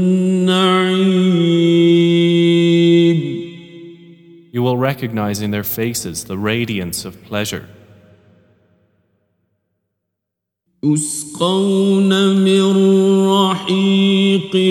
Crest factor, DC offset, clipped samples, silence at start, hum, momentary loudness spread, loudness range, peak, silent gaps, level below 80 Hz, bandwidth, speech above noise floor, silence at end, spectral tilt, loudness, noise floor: 14 dB; under 0.1%; under 0.1%; 0 s; none; 11 LU; 13 LU; 0 dBFS; none; -56 dBFS; 18 kHz; 64 dB; 0 s; -5.5 dB/octave; -15 LUFS; -80 dBFS